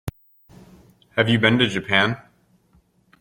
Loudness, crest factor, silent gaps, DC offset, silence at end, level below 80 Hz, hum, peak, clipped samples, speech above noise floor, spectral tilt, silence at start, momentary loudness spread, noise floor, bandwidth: -19 LUFS; 22 dB; none; under 0.1%; 1.05 s; -52 dBFS; none; -2 dBFS; under 0.1%; 41 dB; -5.5 dB/octave; 0.05 s; 15 LU; -60 dBFS; 16.5 kHz